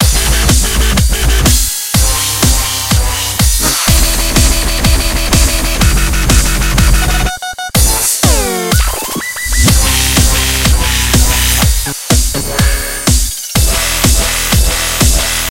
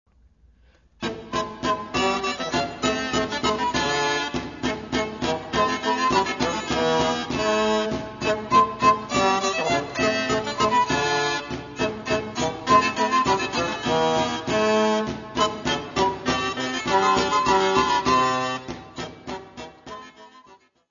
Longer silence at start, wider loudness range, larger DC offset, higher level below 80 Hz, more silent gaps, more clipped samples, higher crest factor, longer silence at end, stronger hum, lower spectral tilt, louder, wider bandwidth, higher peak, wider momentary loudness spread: second, 0 s vs 1 s; about the same, 1 LU vs 3 LU; neither; first, -14 dBFS vs -48 dBFS; neither; first, 0.2% vs under 0.1%; second, 10 dB vs 20 dB; second, 0 s vs 0.35 s; neither; about the same, -3 dB/octave vs -3.5 dB/octave; first, -11 LUFS vs -23 LUFS; first, 17 kHz vs 7.4 kHz; first, 0 dBFS vs -4 dBFS; second, 4 LU vs 9 LU